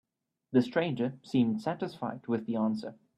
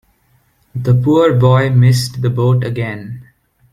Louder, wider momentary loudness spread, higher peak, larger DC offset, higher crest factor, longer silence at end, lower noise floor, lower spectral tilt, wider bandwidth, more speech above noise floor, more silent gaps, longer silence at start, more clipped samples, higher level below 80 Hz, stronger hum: second, -31 LUFS vs -13 LUFS; second, 8 LU vs 18 LU; second, -14 dBFS vs -2 dBFS; neither; first, 18 dB vs 12 dB; second, 0.25 s vs 0.5 s; first, -68 dBFS vs -56 dBFS; about the same, -7.5 dB/octave vs -7 dB/octave; second, 9.8 kHz vs 13 kHz; second, 37 dB vs 44 dB; neither; second, 0.5 s vs 0.75 s; neither; second, -72 dBFS vs -46 dBFS; neither